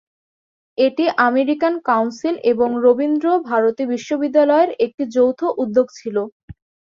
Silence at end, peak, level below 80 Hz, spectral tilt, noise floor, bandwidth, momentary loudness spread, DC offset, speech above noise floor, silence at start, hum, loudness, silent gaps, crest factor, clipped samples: 0.4 s; -2 dBFS; -58 dBFS; -5.5 dB/octave; under -90 dBFS; 7.4 kHz; 7 LU; under 0.1%; over 73 dB; 0.8 s; none; -18 LUFS; 4.94-4.98 s, 6.32-6.48 s; 16 dB; under 0.1%